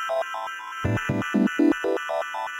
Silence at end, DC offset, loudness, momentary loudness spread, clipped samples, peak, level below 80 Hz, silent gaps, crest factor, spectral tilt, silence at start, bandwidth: 0 s; under 0.1%; -25 LUFS; 9 LU; under 0.1%; -10 dBFS; -52 dBFS; none; 16 dB; -6 dB/octave; 0 s; 16 kHz